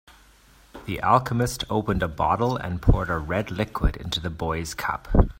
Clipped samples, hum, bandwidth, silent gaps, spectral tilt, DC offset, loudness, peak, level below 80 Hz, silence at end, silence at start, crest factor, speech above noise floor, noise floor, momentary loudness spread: under 0.1%; none; 16.5 kHz; none; -6 dB/octave; under 0.1%; -25 LUFS; -2 dBFS; -30 dBFS; 0.05 s; 0.75 s; 24 dB; 31 dB; -54 dBFS; 8 LU